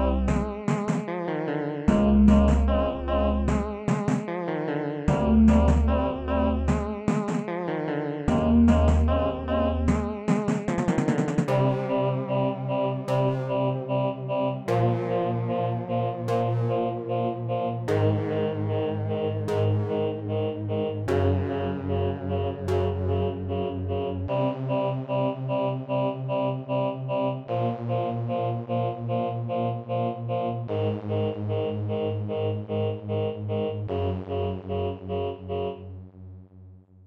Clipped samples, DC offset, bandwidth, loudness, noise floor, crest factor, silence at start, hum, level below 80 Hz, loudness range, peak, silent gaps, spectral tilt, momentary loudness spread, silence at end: under 0.1%; under 0.1%; 9 kHz; -26 LUFS; -49 dBFS; 18 dB; 0 s; none; -36 dBFS; 5 LU; -6 dBFS; none; -8.5 dB/octave; 7 LU; 0.25 s